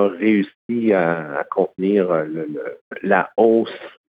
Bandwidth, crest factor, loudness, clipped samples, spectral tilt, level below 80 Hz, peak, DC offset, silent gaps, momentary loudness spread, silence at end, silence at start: 4.9 kHz; 18 dB; -19 LUFS; under 0.1%; -9.5 dB/octave; -72 dBFS; -2 dBFS; under 0.1%; 0.55-0.69 s, 2.81-2.91 s; 13 LU; 0.2 s; 0 s